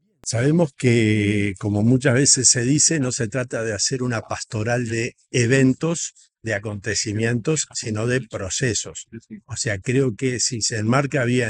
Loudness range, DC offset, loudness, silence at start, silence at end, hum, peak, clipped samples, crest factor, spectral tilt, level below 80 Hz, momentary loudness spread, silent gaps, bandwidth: 6 LU; under 0.1%; -20 LUFS; 0.25 s; 0 s; none; -2 dBFS; under 0.1%; 20 dB; -4 dB/octave; -56 dBFS; 11 LU; none; 11 kHz